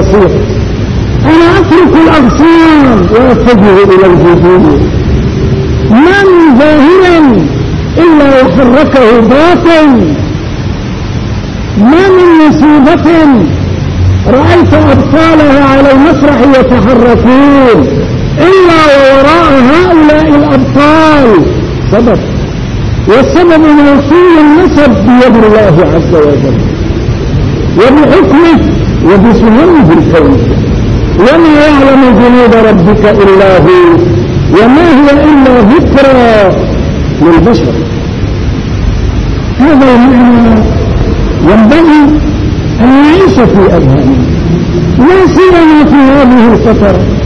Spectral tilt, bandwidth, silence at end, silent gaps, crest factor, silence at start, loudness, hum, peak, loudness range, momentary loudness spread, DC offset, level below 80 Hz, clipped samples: -7.5 dB/octave; 10 kHz; 0 s; none; 4 dB; 0 s; -4 LUFS; none; 0 dBFS; 3 LU; 8 LU; under 0.1%; -18 dBFS; 10%